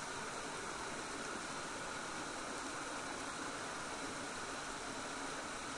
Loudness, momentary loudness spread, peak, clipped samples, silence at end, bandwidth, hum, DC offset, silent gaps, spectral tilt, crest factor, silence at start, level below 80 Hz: -43 LUFS; 0 LU; -30 dBFS; under 0.1%; 0 s; 11.5 kHz; none; under 0.1%; none; -2 dB/octave; 14 dB; 0 s; -66 dBFS